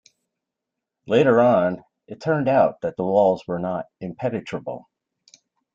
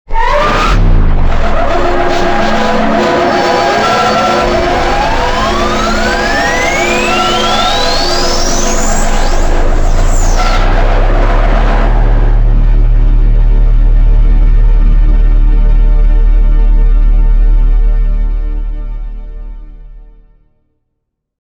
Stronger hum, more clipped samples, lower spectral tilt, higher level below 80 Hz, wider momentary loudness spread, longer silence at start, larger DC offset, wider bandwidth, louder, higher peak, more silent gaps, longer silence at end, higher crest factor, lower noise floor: neither; neither; first, -7.5 dB/octave vs -4.5 dB/octave; second, -64 dBFS vs -10 dBFS; first, 18 LU vs 5 LU; first, 1.05 s vs 0.1 s; neither; second, 7.6 kHz vs 18.5 kHz; second, -21 LUFS vs -12 LUFS; second, -4 dBFS vs 0 dBFS; neither; second, 0.95 s vs 1.45 s; first, 18 dB vs 8 dB; first, -84 dBFS vs -69 dBFS